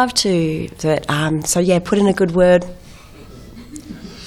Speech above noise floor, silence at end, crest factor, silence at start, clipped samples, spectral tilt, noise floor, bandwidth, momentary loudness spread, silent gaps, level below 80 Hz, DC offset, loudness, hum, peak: 23 dB; 0 s; 16 dB; 0 s; under 0.1%; -4.5 dB/octave; -39 dBFS; 15 kHz; 21 LU; none; -42 dBFS; under 0.1%; -16 LUFS; none; -2 dBFS